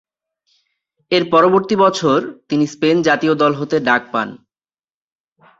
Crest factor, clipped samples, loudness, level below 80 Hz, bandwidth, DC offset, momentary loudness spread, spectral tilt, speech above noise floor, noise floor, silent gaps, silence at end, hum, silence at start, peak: 16 dB; under 0.1%; -15 LUFS; -60 dBFS; 8 kHz; under 0.1%; 8 LU; -5.5 dB/octave; over 75 dB; under -90 dBFS; none; 1.25 s; none; 1.1 s; 0 dBFS